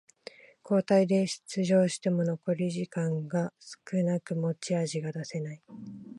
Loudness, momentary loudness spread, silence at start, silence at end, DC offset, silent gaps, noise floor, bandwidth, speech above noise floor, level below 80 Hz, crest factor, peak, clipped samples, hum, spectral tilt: -29 LUFS; 20 LU; 0.65 s; 0 s; under 0.1%; none; -51 dBFS; 11.5 kHz; 22 dB; -76 dBFS; 18 dB; -12 dBFS; under 0.1%; none; -6.5 dB/octave